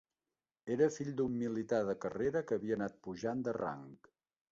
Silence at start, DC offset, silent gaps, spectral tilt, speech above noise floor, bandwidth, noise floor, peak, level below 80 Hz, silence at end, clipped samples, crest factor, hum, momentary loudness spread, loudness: 0.65 s; under 0.1%; none; -7 dB/octave; over 54 dB; 7.6 kHz; under -90 dBFS; -18 dBFS; -70 dBFS; 0.55 s; under 0.1%; 20 dB; none; 9 LU; -37 LUFS